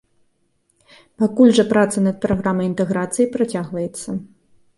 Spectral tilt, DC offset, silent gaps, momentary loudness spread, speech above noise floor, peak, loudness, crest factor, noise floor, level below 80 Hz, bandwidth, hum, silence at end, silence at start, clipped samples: -6 dB/octave; under 0.1%; none; 13 LU; 47 dB; -2 dBFS; -18 LUFS; 18 dB; -65 dBFS; -50 dBFS; 11.5 kHz; none; 0.5 s; 1.2 s; under 0.1%